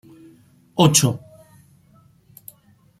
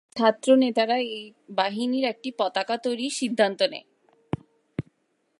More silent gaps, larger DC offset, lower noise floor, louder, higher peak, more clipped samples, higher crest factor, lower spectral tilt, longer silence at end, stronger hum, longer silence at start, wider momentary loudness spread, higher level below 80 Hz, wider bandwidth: neither; neither; second, -56 dBFS vs -71 dBFS; first, -17 LUFS vs -25 LUFS; first, 0 dBFS vs -6 dBFS; neither; first, 24 dB vs 18 dB; about the same, -4 dB/octave vs -4.5 dB/octave; first, 1.8 s vs 0.6 s; neither; first, 0.75 s vs 0.15 s; first, 28 LU vs 17 LU; first, -56 dBFS vs -64 dBFS; first, 15.5 kHz vs 11.5 kHz